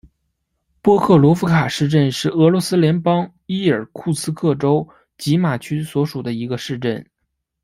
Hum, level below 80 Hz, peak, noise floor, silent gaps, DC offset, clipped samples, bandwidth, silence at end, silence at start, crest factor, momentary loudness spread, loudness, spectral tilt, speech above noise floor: none; -54 dBFS; -2 dBFS; -74 dBFS; none; under 0.1%; under 0.1%; 15.5 kHz; 0.6 s; 0.85 s; 16 dB; 11 LU; -18 LUFS; -6.5 dB/octave; 58 dB